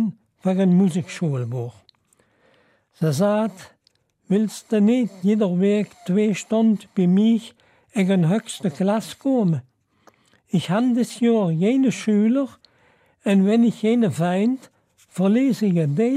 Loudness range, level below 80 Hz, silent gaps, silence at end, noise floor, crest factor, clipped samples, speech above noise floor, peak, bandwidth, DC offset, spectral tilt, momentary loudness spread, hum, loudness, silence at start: 4 LU; -72 dBFS; none; 0 s; -65 dBFS; 12 dB; under 0.1%; 46 dB; -10 dBFS; 13.5 kHz; under 0.1%; -7 dB/octave; 9 LU; none; -21 LUFS; 0 s